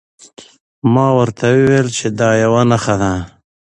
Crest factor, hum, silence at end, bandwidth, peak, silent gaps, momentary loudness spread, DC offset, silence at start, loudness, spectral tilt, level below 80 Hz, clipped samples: 14 dB; none; 0.35 s; 10.5 kHz; 0 dBFS; 0.60-0.82 s; 7 LU; under 0.1%; 0.4 s; -14 LUFS; -6 dB/octave; -42 dBFS; under 0.1%